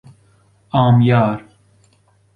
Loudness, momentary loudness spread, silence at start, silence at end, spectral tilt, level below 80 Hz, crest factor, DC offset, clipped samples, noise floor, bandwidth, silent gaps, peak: -15 LUFS; 10 LU; 0.75 s; 0.95 s; -9.5 dB/octave; -50 dBFS; 16 dB; under 0.1%; under 0.1%; -56 dBFS; 4.4 kHz; none; -2 dBFS